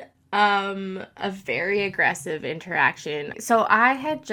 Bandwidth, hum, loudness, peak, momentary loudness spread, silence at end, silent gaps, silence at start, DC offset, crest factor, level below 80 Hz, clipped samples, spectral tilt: 20 kHz; none; -23 LUFS; -4 dBFS; 12 LU; 0 s; none; 0 s; under 0.1%; 20 dB; -66 dBFS; under 0.1%; -4 dB/octave